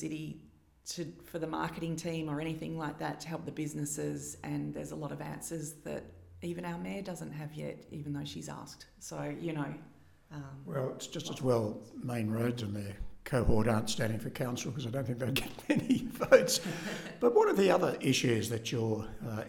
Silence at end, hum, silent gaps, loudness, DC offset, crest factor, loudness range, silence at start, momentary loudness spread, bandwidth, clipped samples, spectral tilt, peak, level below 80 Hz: 0 s; none; none; -34 LUFS; under 0.1%; 26 dB; 12 LU; 0 s; 15 LU; 18 kHz; under 0.1%; -5 dB/octave; -8 dBFS; -52 dBFS